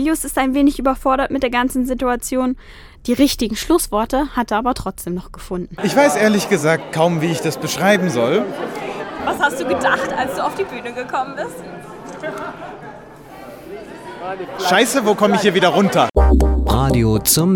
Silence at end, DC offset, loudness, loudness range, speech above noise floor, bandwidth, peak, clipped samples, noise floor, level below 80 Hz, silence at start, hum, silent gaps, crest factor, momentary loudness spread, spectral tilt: 0 s; under 0.1%; -17 LUFS; 10 LU; 20 dB; 18 kHz; 0 dBFS; under 0.1%; -37 dBFS; -28 dBFS; 0 s; none; none; 16 dB; 16 LU; -4.5 dB/octave